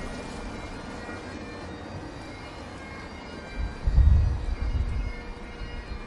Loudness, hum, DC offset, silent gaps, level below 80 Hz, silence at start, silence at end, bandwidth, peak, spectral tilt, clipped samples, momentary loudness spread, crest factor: -31 LUFS; none; under 0.1%; none; -30 dBFS; 0 s; 0 s; 11 kHz; -8 dBFS; -7 dB/octave; under 0.1%; 16 LU; 20 dB